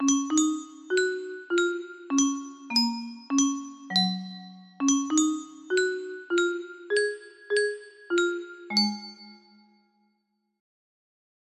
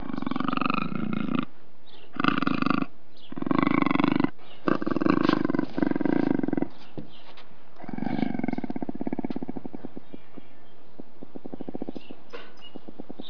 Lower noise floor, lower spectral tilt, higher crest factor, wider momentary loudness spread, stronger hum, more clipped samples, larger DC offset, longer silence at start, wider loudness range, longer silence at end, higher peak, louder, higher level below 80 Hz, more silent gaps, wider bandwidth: first, -76 dBFS vs -55 dBFS; second, -2.5 dB/octave vs -8 dB/octave; second, 18 dB vs 24 dB; second, 12 LU vs 21 LU; neither; neither; second, under 0.1% vs 4%; about the same, 0 s vs 0 s; second, 4 LU vs 15 LU; first, 2.2 s vs 0 s; second, -10 dBFS vs -4 dBFS; about the same, -27 LUFS vs -28 LUFS; second, -76 dBFS vs -62 dBFS; neither; first, 13.5 kHz vs 5.4 kHz